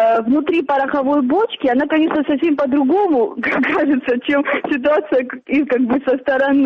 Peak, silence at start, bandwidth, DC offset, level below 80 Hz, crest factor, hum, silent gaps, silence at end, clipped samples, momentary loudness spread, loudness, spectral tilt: -6 dBFS; 0 s; 5.8 kHz; under 0.1%; -56 dBFS; 10 dB; none; none; 0 s; under 0.1%; 3 LU; -16 LUFS; -7 dB/octave